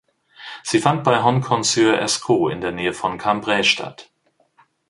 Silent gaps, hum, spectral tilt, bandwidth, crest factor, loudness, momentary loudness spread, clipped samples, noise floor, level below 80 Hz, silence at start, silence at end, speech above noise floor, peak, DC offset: none; none; -4 dB/octave; 11.5 kHz; 20 dB; -19 LUFS; 9 LU; under 0.1%; -60 dBFS; -56 dBFS; 0.4 s; 0.85 s; 41 dB; 0 dBFS; under 0.1%